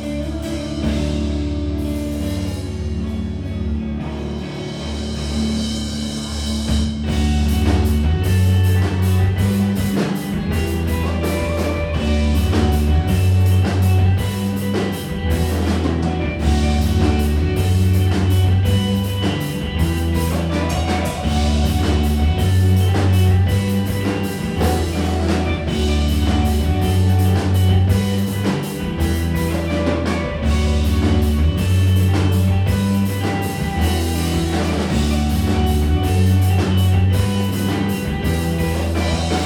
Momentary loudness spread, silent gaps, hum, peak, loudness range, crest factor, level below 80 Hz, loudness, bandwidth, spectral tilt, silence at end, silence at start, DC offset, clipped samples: 7 LU; none; none; -4 dBFS; 6 LU; 14 dB; -24 dBFS; -19 LUFS; 17.5 kHz; -6.5 dB/octave; 0 s; 0 s; under 0.1%; under 0.1%